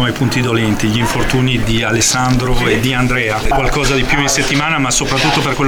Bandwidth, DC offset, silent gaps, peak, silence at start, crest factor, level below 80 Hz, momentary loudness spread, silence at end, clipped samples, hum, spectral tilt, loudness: over 20 kHz; under 0.1%; none; 0 dBFS; 0 s; 12 dB; -24 dBFS; 3 LU; 0 s; under 0.1%; none; -4 dB/octave; -13 LUFS